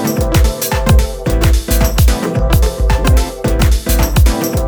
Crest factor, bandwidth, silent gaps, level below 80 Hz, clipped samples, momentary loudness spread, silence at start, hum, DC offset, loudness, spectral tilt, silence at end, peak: 12 dB; over 20 kHz; none; -14 dBFS; under 0.1%; 3 LU; 0 s; none; under 0.1%; -13 LUFS; -5.5 dB/octave; 0 s; 0 dBFS